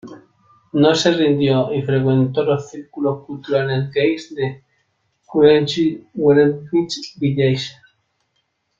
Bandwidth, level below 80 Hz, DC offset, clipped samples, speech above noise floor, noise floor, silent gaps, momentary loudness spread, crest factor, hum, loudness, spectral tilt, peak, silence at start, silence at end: 7.8 kHz; -58 dBFS; under 0.1%; under 0.1%; 52 dB; -69 dBFS; none; 11 LU; 16 dB; none; -18 LUFS; -6.5 dB/octave; -2 dBFS; 0.05 s; 1.1 s